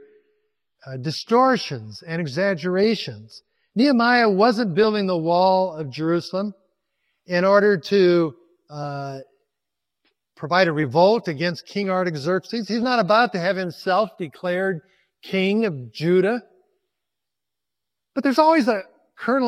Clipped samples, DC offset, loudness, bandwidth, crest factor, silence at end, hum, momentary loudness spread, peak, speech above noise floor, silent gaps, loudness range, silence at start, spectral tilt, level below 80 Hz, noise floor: under 0.1%; under 0.1%; -21 LUFS; 13.5 kHz; 20 dB; 0 s; none; 14 LU; -2 dBFS; 65 dB; none; 4 LU; 0.85 s; -6.5 dB/octave; -70 dBFS; -86 dBFS